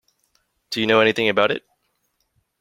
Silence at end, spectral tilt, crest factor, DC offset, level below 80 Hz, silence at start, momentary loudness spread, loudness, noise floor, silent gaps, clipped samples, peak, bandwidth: 1 s; -4.5 dB/octave; 20 dB; under 0.1%; -64 dBFS; 0.7 s; 12 LU; -19 LUFS; -71 dBFS; none; under 0.1%; -2 dBFS; 16 kHz